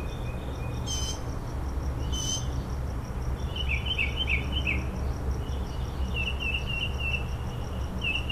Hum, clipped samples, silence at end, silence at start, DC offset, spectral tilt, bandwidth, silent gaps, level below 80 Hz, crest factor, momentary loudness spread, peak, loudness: none; under 0.1%; 0 s; 0 s; under 0.1%; -4 dB/octave; 15 kHz; none; -32 dBFS; 16 dB; 8 LU; -14 dBFS; -31 LUFS